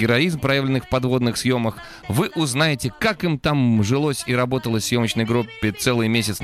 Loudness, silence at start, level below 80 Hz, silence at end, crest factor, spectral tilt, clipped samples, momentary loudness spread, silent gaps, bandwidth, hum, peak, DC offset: -20 LUFS; 0 s; -46 dBFS; 0 s; 16 dB; -5 dB/octave; under 0.1%; 4 LU; none; 15 kHz; none; -4 dBFS; under 0.1%